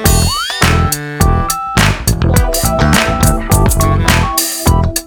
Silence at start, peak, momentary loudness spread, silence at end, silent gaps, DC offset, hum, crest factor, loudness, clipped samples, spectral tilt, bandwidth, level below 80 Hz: 0 s; 0 dBFS; 3 LU; 0 s; none; under 0.1%; none; 12 dB; -12 LUFS; under 0.1%; -4 dB/octave; over 20 kHz; -18 dBFS